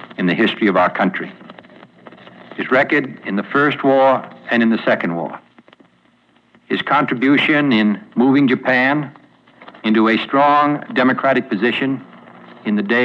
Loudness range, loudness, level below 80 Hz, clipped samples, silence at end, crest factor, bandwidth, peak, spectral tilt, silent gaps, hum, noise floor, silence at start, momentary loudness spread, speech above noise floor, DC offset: 3 LU; -16 LUFS; -70 dBFS; under 0.1%; 0 s; 12 dB; 6.8 kHz; -4 dBFS; -7.5 dB/octave; none; none; -56 dBFS; 0 s; 11 LU; 40 dB; under 0.1%